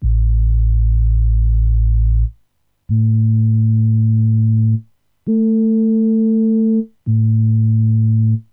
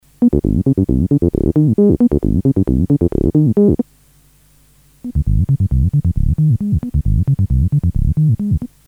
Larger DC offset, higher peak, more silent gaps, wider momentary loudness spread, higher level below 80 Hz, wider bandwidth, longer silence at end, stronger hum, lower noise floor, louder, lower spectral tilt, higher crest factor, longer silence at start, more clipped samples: neither; second, -6 dBFS vs 0 dBFS; neither; about the same, 4 LU vs 6 LU; about the same, -18 dBFS vs -22 dBFS; second, 0.9 kHz vs 2.1 kHz; about the same, 0.1 s vs 0.2 s; second, none vs 50 Hz at -35 dBFS; first, -60 dBFS vs -50 dBFS; about the same, -15 LUFS vs -15 LUFS; first, -16 dB/octave vs -12 dB/octave; second, 6 dB vs 14 dB; second, 0 s vs 0.2 s; neither